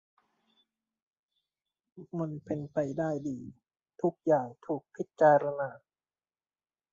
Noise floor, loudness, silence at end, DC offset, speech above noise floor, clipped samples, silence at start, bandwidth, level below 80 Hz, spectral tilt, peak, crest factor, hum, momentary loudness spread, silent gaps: under -90 dBFS; -31 LUFS; 1.15 s; under 0.1%; over 60 dB; under 0.1%; 1.95 s; 7.4 kHz; -72 dBFS; -8.5 dB/octave; -12 dBFS; 22 dB; none; 16 LU; none